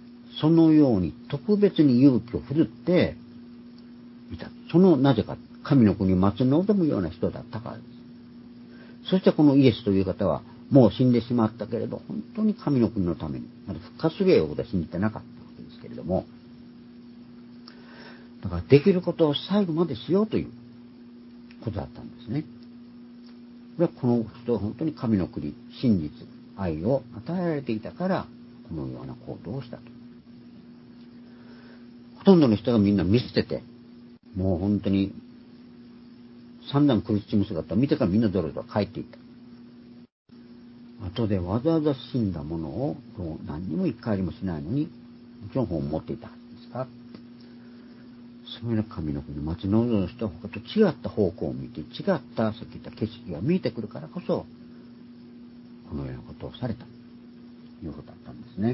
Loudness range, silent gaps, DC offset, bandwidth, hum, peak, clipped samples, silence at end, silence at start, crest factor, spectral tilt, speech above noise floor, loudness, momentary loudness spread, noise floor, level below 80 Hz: 13 LU; 40.12-40.25 s; under 0.1%; 5.8 kHz; none; -4 dBFS; under 0.1%; 0 s; 0 s; 22 dB; -12 dB/octave; 24 dB; -25 LUFS; 26 LU; -48 dBFS; -48 dBFS